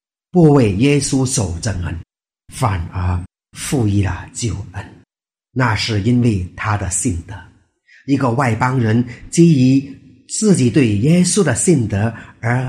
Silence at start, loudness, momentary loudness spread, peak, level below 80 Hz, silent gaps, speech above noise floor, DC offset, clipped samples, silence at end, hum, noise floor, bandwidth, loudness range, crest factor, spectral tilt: 0.35 s; -16 LUFS; 15 LU; 0 dBFS; -40 dBFS; none; 61 dB; under 0.1%; under 0.1%; 0 s; none; -77 dBFS; 14.5 kHz; 7 LU; 16 dB; -5.5 dB/octave